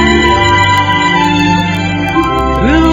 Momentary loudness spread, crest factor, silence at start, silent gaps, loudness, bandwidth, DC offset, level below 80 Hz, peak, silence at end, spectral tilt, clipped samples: 4 LU; 10 dB; 0 s; none; -10 LUFS; 16.5 kHz; under 0.1%; -22 dBFS; 0 dBFS; 0 s; -5 dB/octave; under 0.1%